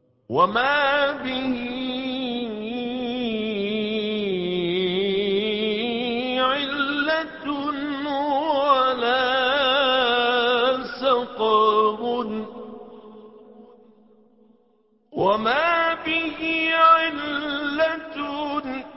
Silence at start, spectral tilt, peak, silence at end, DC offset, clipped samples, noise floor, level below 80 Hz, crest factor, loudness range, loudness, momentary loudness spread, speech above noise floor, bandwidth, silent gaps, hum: 0.3 s; -8.5 dB/octave; -4 dBFS; 0 s; under 0.1%; under 0.1%; -63 dBFS; -58 dBFS; 18 dB; 6 LU; -22 LUFS; 9 LU; 41 dB; 5.8 kHz; none; none